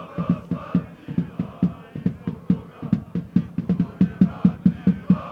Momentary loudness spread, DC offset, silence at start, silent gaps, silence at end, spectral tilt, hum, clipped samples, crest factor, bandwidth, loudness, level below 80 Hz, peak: 9 LU; under 0.1%; 0 s; none; 0 s; -10.5 dB/octave; none; under 0.1%; 20 dB; 4.5 kHz; -24 LUFS; -48 dBFS; -4 dBFS